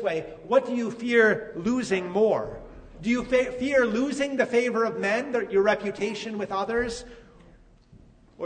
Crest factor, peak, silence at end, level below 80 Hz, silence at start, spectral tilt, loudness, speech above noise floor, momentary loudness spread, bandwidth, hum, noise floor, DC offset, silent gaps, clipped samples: 18 dB; -8 dBFS; 0 s; -54 dBFS; 0 s; -5 dB/octave; -25 LUFS; 29 dB; 8 LU; 9.6 kHz; none; -54 dBFS; under 0.1%; none; under 0.1%